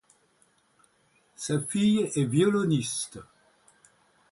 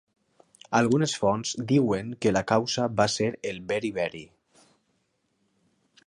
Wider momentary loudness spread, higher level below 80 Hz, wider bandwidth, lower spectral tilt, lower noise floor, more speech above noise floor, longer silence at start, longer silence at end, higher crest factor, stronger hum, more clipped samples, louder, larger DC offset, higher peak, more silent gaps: first, 14 LU vs 7 LU; second, -66 dBFS vs -60 dBFS; about the same, 11.5 kHz vs 11.5 kHz; about the same, -5.5 dB/octave vs -5 dB/octave; second, -67 dBFS vs -73 dBFS; second, 41 dB vs 48 dB; first, 1.4 s vs 0.7 s; second, 1.1 s vs 1.8 s; about the same, 18 dB vs 20 dB; neither; neither; about the same, -26 LUFS vs -26 LUFS; neither; second, -12 dBFS vs -8 dBFS; neither